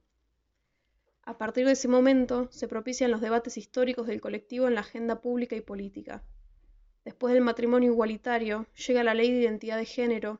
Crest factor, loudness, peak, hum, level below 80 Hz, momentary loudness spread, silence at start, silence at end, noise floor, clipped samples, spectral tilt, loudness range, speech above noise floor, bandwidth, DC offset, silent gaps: 16 dB; -28 LUFS; -12 dBFS; none; -60 dBFS; 15 LU; 1.25 s; 0.05 s; -77 dBFS; under 0.1%; -3.5 dB/octave; 5 LU; 49 dB; 7.8 kHz; under 0.1%; none